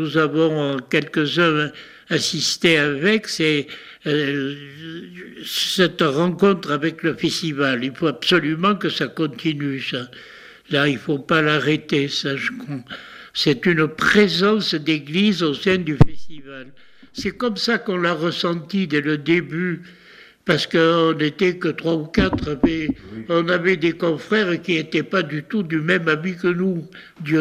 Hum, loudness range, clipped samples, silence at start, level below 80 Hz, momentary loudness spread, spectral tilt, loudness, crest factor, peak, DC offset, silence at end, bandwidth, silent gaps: none; 3 LU; under 0.1%; 0 s; -42 dBFS; 13 LU; -5 dB/octave; -20 LUFS; 20 dB; 0 dBFS; under 0.1%; 0 s; 15.5 kHz; none